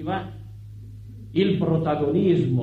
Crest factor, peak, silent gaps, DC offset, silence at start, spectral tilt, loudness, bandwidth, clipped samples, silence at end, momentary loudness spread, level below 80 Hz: 16 dB; -8 dBFS; none; under 0.1%; 0 s; -9.5 dB/octave; -23 LUFS; 4.9 kHz; under 0.1%; 0 s; 21 LU; -50 dBFS